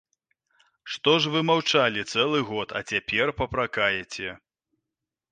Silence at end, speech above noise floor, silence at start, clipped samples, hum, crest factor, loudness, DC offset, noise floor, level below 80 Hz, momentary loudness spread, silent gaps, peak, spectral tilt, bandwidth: 0.95 s; 62 dB; 0.85 s; under 0.1%; none; 20 dB; -24 LUFS; under 0.1%; -87 dBFS; -54 dBFS; 11 LU; none; -6 dBFS; -4 dB/octave; 9.6 kHz